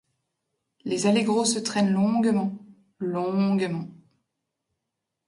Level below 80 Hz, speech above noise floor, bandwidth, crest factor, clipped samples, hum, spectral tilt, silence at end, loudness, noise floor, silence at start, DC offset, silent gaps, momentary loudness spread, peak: -70 dBFS; 60 dB; 11.5 kHz; 16 dB; under 0.1%; none; -5 dB/octave; 1.35 s; -24 LUFS; -83 dBFS; 0.85 s; under 0.1%; none; 12 LU; -10 dBFS